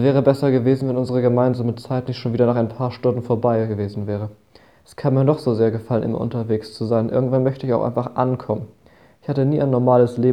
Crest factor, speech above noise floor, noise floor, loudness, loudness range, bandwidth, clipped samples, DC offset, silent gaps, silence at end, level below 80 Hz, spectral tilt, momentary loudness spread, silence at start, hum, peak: 18 dB; 31 dB; -50 dBFS; -20 LUFS; 2 LU; 10 kHz; under 0.1%; 0.1%; none; 0 s; -56 dBFS; -9.5 dB/octave; 9 LU; 0 s; none; -2 dBFS